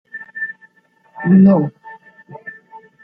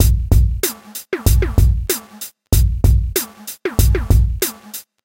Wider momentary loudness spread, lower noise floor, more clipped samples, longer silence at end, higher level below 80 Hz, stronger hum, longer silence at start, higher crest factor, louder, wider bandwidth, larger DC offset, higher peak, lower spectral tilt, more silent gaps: first, 25 LU vs 14 LU; first, -55 dBFS vs -36 dBFS; neither; first, 0.55 s vs 0.25 s; second, -58 dBFS vs -18 dBFS; neither; first, 0.15 s vs 0 s; about the same, 16 dB vs 16 dB; about the same, -15 LUFS vs -17 LUFS; second, 2.9 kHz vs 17 kHz; neither; about the same, -2 dBFS vs 0 dBFS; first, -12.5 dB/octave vs -5 dB/octave; neither